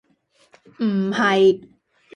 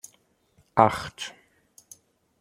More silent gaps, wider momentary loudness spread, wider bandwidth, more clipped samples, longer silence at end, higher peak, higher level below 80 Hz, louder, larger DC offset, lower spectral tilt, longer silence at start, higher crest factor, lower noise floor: neither; second, 10 LU vs 18 LU; second, 9.4 kHz vs 16 kHz; neither; second, 0.55 s vs 1.1 s; second, -6 dBFS vs 0 dBFS; second, -66 dBFS vs -60 dBFS; first, -19 LUFS vs -25 LUFS; neither; about the same, -6 dB/octave vs -5 dB/octave; about the same, 0.8 s vs 0.75 s; second, 16 dB vs 28 dB; second, -61 dBFS vs -65 dBFS